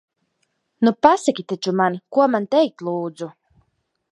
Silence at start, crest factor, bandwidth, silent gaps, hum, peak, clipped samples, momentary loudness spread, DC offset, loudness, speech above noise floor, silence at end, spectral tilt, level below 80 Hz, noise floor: 0.8 s; 20 dB; 11.5 kHz; none; none; 0 dBFS; under 0.1%; 12 LU; under 0.1%; -19 LUFS; 52 dB; 0.8 s; -5.5 dB/octave; -66 dBFS; -71 dBFS